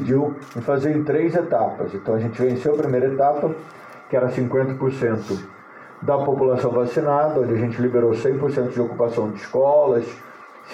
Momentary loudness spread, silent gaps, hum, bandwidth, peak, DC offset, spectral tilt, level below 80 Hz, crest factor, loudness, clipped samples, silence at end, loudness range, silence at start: 10 LU; none; none; 8.6 kHz; -6 dBFS; under 0.1%; -8.5 dB/octave; -60 dBFS; 14 dB; -21 LUFS; under 0.1%; 0 s; 3 LU; 0 s